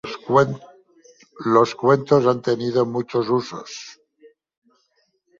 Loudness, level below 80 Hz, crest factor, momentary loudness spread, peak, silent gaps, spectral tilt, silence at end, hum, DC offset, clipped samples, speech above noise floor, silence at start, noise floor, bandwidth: -20 LUFS; -64 dBFS; 20 dB; 18 LU; -2 dBFS; none; -6.5 dB/octave; 1.45 s; none; under 0.1%; under 0.1%; 48 dB; 0.05 s; -67 dBFS; 7.6 kHz